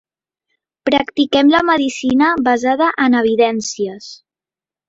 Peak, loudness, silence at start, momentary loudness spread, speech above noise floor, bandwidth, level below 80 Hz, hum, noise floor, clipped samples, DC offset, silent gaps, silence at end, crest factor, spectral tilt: -2 dBFS; -15 LUFS; 0.85 s; 12 LU; over 76 dB; 8 kHz; -54 dBFS; none; under -90 dBFS; under 0.1%; under 0.1%; none; 0.75 s; 14 dB; -3.5 dB/octave